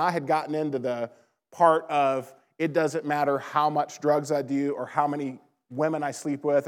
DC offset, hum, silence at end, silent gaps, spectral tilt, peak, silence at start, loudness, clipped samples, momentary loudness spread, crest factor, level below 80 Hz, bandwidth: under 0.1%; none; 0 s; none; -6 dB/octave; -6 dBFS; 0 s; -26 LUFS; under 0.1%; 9 LU; 20 dB; -90 dBFS; 16 kHz